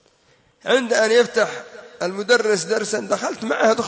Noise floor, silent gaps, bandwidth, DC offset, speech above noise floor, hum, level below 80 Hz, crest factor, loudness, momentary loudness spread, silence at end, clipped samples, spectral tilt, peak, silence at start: -58 dBFS; none; 8 kHz; under 0.1%; 39 dB; none; -70 dBFS; 16 dB; -19 LUFS; 12 LU; 0 s; under 0.1%; -2.5 dB/octave; -4 dBFS; 0.65 s